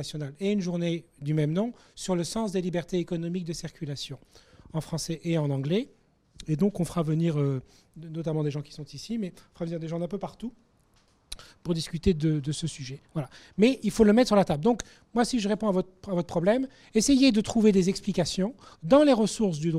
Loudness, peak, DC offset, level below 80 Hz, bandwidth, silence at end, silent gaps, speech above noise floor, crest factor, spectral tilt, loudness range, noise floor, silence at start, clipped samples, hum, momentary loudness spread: -27 LUFS; -8 dBFS; under 0.1%; -50 dBFS; 14 kHz; 0 s; none; 38 dB; 20 dB; -6 dB/octave; 9 LU; -64 dBFS; 0 s; under 0.1%; none; 16 LU